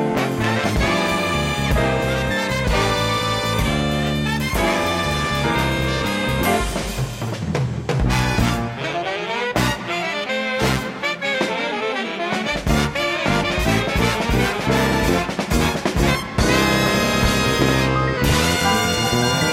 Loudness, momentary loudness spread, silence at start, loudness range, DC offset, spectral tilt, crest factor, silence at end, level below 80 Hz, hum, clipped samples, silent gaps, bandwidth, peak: -19 LUFS; 6 LU; 0 s; 4 LU; under 0.1%; -4.5 dB/octave; 16 dB; 0 s; -30 dBFS; none; under 0.1%; none; 16 kHz; -4 dBFS